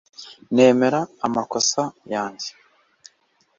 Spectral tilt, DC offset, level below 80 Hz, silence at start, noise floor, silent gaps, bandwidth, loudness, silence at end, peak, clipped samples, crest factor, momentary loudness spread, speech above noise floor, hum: -3.5 dB/octave; under 0.1%; -66 dBFS; 0.2 s; -64 dBFS; none; 7.6 kHz; -20 LUFS; 1.1 s; -2 dBFS; under 0.1%; 20 dB; 18 LU; 44 dB; none